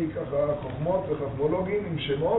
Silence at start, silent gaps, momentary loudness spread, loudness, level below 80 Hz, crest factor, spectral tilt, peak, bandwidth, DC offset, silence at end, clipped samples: 0 s; none; 2 LU; -28 LUFS; -48 dBFS; 14 dB; -6 dB/octave; -14 dBFS; 4.1 kHz; under 0.1%; 0 s; under 0.1%